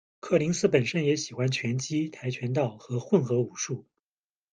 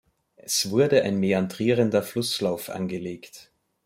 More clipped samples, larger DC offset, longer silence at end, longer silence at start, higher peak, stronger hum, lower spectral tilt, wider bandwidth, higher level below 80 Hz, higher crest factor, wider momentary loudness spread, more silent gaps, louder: neither; neither; first, 0.7 s vs 0.45 s; second, 0.25 s vs 0.45 s; about the same, -8 dBFS vs -6 dBFS; neither; about the same, -5.5 dB/octave vs -4.5 dB/octave; second, 9.8 kHz vs 16.5 kHz; about the same, -66 dBFS vs -66 dBFS; about the same, 20 dB vs 18 dB; second, 9 LU vs 15 LU; neither; second, -28 LUFS vs -24 LUFS